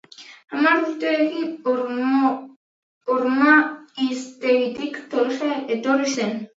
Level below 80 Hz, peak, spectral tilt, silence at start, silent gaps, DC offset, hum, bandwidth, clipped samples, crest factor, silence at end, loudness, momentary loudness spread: -76 dBFS; -2 dBFS; -4 dB/octave; 0.2 s; 2.56-3.01 s; under 0.1%; none; 8 kHz; under 0.1%; 20 dB; 0.1 s; -21 LUFS; 10 LU